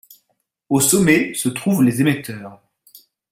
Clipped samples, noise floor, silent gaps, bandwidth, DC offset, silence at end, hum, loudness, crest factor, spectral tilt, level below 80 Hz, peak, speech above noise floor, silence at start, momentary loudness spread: under 0.1%; -70 dBFS; none; 16.5 kHz; under 0.1%; 0.75 s; none; -17 LUFS; 18 dB; -4.5 dB/octave; -54 dBFS; -2 dBFS; 53 dB; 0.7 s; 12 LU